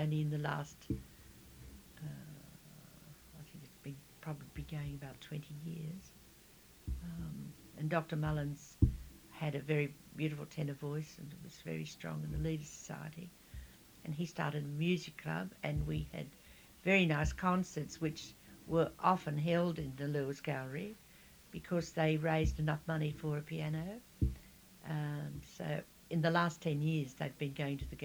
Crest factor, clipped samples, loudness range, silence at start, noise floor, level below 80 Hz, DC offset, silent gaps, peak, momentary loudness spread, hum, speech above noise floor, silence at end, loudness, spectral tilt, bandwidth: 24 dB; under 0.1%; 11 LU; 0 s; -61 dBFS; -52 dBFS; under 0.1%; none; -14 dBFS; 21 LU; none; 24 dB; 0 s; -38 LUFS; -6.5 dB/octave; over 20 kHz